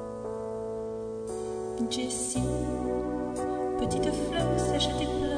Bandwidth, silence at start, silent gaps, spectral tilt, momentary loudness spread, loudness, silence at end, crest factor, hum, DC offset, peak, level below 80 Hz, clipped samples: 10 kHz; 0 s; none; -5 dB/octave; 8 LU; -31 LUFS; 0 s; 16 dB; none; under 0.1%; -16 dBFS; -44 dBFS; under 0.1%